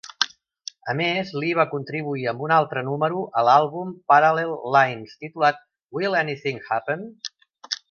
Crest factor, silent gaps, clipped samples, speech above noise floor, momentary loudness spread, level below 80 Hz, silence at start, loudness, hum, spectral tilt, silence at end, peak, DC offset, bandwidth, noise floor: 22 dB; none; under 0.1%; 21 dB; 17 LU; -70 dBFS; 0.05 s; -22 LUFS; none; -4.5 dB/octave; 0.15 s; 0 dBFS; under 0.1%; 7.2 kHz; -43 dBFS